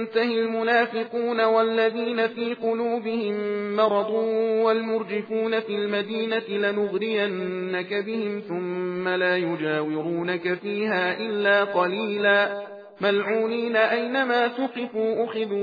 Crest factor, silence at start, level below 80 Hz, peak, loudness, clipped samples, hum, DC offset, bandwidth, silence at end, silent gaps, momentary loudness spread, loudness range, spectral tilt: 16 dB; 0 s; -86 dBFS; -8 dBFS; -24 LUFS; under 0.1%; none; under 0.1%; 5 kHz; 0 s; none; 7 LU; 3 LU; -7.5 dB/octave